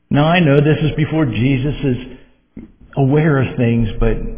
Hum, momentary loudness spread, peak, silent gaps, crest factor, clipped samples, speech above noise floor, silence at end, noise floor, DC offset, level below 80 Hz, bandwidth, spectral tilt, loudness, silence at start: none; 8 LU; 0 dBFS; none; 16 dB; under 0.1%; 24 dB; 0 s; -38 dBFS; under 0.1%; -28 dBFS; 3.6 kHz; -11.5 dB/octave; -15 LUFS; 0.1 s